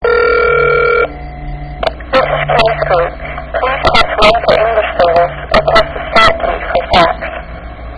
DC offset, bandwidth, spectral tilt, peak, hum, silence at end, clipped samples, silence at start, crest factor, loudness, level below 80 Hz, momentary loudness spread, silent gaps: under 0.1%; 11 kHz; -5 dB/octave; 0 dBFS; none; 0 s; 0.5%; 0 s; 12 dB; -11 LUFS; -26 dBFS; 14 LU; none